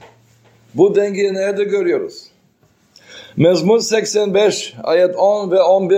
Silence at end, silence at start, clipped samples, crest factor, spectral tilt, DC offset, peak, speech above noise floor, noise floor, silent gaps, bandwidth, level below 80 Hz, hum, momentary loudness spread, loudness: 0 s; 0.75 s; under 0.1%; 16 dB; -5 dB/octave; under 0.1%; 0 dBFS; 42 dB; -56 dBFS; none; 15.5 kHz; -62 dBFS; none; 8 LU; -15 LUFS